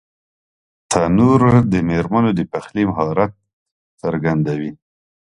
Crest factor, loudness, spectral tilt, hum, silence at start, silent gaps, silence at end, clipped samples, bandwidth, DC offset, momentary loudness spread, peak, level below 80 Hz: 18 dB; -17 LUFS; -7 dB/octave; none; 0.9 s; 3.53-3.66 s, 3.72-3.98 s; 0.45 s; under 0.1%; 11.5 kHz; under 0.1%; 11 LU; 0 dBFS; -42 dBFS